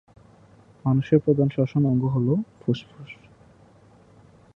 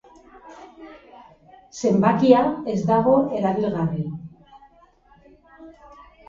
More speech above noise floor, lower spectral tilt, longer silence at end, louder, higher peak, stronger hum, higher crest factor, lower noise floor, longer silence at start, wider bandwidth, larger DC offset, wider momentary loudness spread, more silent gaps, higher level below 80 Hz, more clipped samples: second, 31 dB vs 36 dB; first, -10 dB/octave vs -7.5 dB/octave; first, 1.45 s vs 0.55 s; second, -23 LUFS vs -20 LUFS; about the same, -4 dBFS vs -2 dBFS; neither; about the same, 20 dB vs 22 dB; about the same, -53 dBFS vs -55 dBFS; first, 0.85 s vs 0.45 s; second, 6.2 kHz vs 7.6 kHz; neither; second, 22 LU vs 26 LU; neither; about the same, -58 dBFS vs -56 dBFS; neither